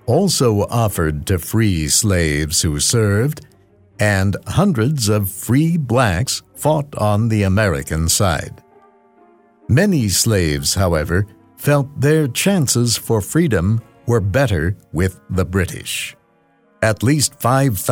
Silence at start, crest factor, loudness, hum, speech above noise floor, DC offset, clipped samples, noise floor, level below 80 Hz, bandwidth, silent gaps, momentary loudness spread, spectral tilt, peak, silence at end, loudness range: 0.05 s; 14 dB; -17 LUFS; none; 40 dB; under 0.1%; under 0.1%; -56 dBFS; -36 dBFS; over 20 kHz; none; 6 LU; -4.5 dB/octave; -2 dBFS; 0 s; 3 LU